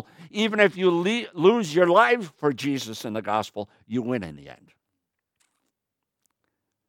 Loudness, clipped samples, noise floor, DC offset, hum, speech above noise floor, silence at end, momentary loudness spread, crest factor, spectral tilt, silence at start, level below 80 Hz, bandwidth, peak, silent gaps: -23 LUFS; under 0.1%; -84 dBFS; under 0.1%; none; 61 dB; 2.35 s; 13 LU; 22 dB; -5 dB/octave; 0.2 s; -68 dBFS; 16.5 kHz; -4 dBFS; none